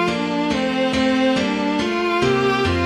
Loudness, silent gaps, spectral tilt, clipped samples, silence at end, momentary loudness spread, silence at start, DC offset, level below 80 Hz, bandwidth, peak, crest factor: -19 LUFS; none; -5.5 dB/octave; under 0.1%; 0 s; 3 LU; 0 s; under 0.1%; -42 dBFS; 12 kHz; -6 dBFS; 12 dB